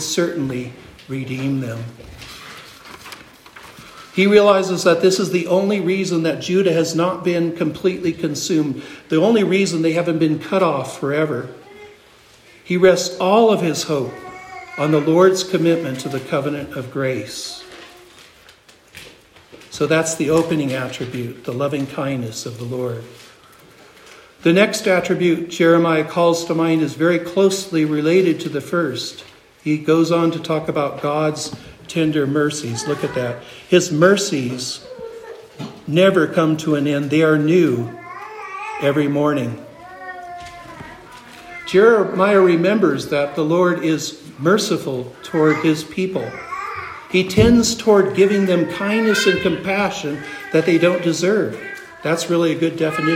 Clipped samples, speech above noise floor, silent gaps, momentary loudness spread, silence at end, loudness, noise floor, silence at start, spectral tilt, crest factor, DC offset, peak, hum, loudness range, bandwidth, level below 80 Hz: under 0.1%; 31 dB; none; 19 LU; 0 s; -18 LUFS; -48 dBFS; 0 s; -5 dB/octave; 18 dB; under 0.1%; 0 dBFS; none; 7 LU; 16 kHz; -50 dBFS